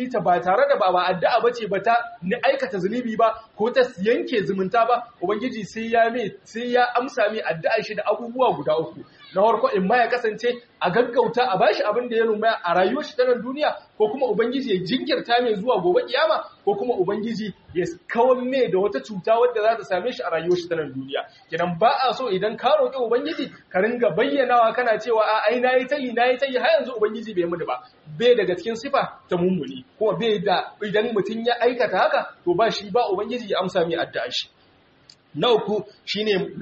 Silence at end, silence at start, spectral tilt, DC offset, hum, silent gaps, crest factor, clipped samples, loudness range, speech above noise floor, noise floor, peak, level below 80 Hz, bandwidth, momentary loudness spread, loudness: 0 s; 0 s; -3 dB/octave; under 0.1%; none; none; 16 dB; under 0.1%; 3 LU; 35 dB; -57 dBFS; -6 dBFS; -66 dBFS; 8 kHz; 8 LU; -22 LUFS